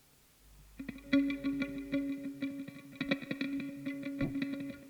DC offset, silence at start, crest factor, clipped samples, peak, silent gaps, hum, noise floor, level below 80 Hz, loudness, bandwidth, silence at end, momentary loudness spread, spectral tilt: under 0.1%; 0.45 s; 22 dB; under 0.1%; -16 dBFS; none; none; -64 dBFS; -60 dBFS; -37 LUFS; 19.5 kHz; 0 s; 14 LU; -6 dB/octave